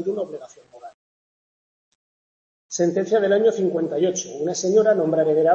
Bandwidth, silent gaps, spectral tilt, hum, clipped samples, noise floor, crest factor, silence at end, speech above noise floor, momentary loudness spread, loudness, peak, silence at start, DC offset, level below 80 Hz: 7.6 kHz; 0.94-2.69 s; -5 dB/octave; none; under 0.1%; under -90 dBFS; 16 dB; 0 s; over 70 dB; 11 LU; -20 LUFS; -6 dBFS; 0 s; under 0.1%; -72 dBFS